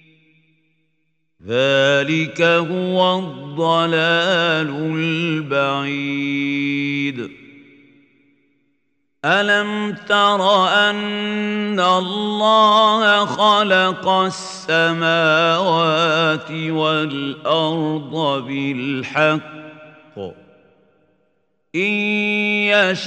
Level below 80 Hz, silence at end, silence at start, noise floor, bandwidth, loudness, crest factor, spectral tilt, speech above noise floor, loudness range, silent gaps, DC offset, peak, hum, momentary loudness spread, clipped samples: -70 dBFS; 0 s; 1.45 s; -71 dBFS; 9.4 kHz; -17 LUFS; 18 dB; -5 dB/octave; 54 dB; 8 LU; none; under 0.1%; 0 dBFS; none; 9 LU; under 0.1%